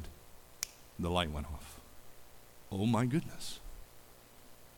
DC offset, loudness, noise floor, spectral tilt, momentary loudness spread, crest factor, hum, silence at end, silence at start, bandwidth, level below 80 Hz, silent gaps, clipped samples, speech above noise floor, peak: under 0.1%; -37 LUFS; -57 dBFS; -5 dB/octave; 26 LU; 26 dB; none; 0 s; 0 s; 19 kHz; -52 dBFS; none; under 0.1%; 22 dB; -12 dBFS